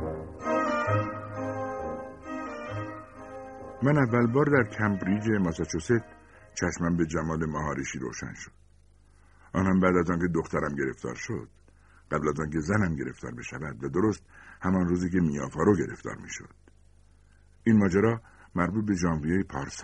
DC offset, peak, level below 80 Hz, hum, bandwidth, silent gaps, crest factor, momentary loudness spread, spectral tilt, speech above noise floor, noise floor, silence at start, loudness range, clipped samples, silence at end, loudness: under 0.1%; -6 dBFS; -50 dBFS; none; 9.6 kHz; none; 22 dB; 15 LU; -7 dB/octave; 30 dB; -58 dBFS; 0 s; 5 LU; under 0.1%; 0 s; -28 LUFS